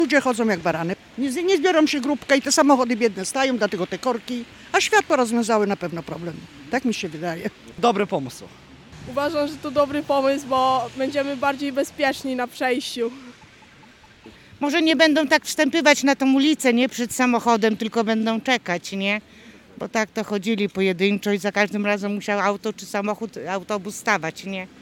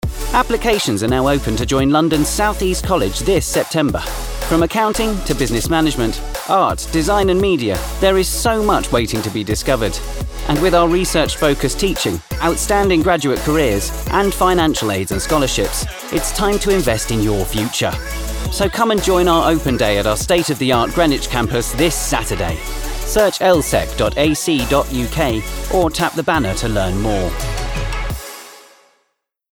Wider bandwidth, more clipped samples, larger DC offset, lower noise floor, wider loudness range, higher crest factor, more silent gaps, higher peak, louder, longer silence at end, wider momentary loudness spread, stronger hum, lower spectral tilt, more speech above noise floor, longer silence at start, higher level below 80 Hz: second, 17.5 kHz vs over 20 kHz; neither; neither; second, -49 dBFS vs -69 dBFS; first, 6 LU vs 2 LU; first, 22 dB vs 16 dB; neither; about the same, 0 dBFS vs -2 dBFS; second, -21 LUFS vs -17 LUFS; second, 0.15 s vs 0.9 s; first, 11 LU vs 8 LU; neither; about the same, -4 dB/octave vs -4.5 dB/octave; second, 28 dB vs 53 dB; about the same, 0 s vs 0.05 s; second, -62 dBFS vs -26 dBFS